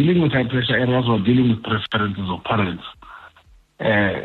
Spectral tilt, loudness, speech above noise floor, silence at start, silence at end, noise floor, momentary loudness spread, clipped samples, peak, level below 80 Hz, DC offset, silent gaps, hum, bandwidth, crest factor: -9 dB/octave; -20 LUFS; 33 dB; 0 s; 0 s; -52 dBFS; 8 LU; under 0.1%; -8 dBFS; -48 dBFS; under 0.1%; none; none; 4.5 kHz; 12 dB